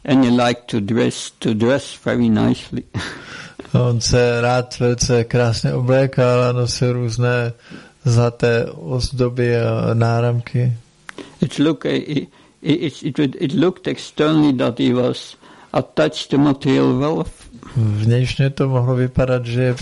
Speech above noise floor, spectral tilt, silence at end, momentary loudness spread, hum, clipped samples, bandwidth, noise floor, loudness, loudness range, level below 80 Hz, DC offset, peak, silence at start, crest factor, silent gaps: 20 dB; -6 dB/octave; 0 s; 11 LU; none; under 0.1%; 11.5 kHz; -38 dBFS; -18 LUFS; 3 LU; -40 dBFS; under 0.1%; -2 dBFS; 0.05 s; 16 dB; none